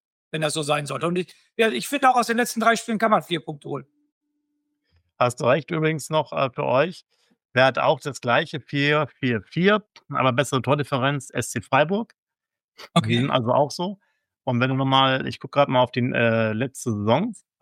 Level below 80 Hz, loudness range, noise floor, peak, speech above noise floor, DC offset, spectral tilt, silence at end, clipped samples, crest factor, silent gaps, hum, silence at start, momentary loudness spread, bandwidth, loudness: -66 dBFS; 3 LU; -88 dBFS; -4 dBFS; 66 dB; under 0.1%; -5 dB/octave; 0.3 s; under 0.1%; 18 dB; 4.12-4.21 s, 7.45-7.49 s, 12.18-12.27 s, 12.64-12.72 s; none; 0.35 s; 9 LU; 16.5 kHz; -22 LUFS